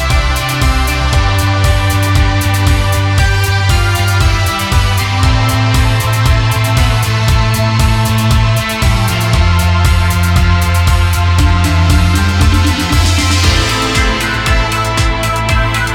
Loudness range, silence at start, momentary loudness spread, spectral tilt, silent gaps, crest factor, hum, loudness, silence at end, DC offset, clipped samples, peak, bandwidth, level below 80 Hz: 1 LU; 0 s; 2 LU; -4.5 dB/octave; none; 10 dB; none; -11 LUFS; 0 s; under 0.1%; under 0.1%; 0 dBFS; 18 kHz; -16 dBFS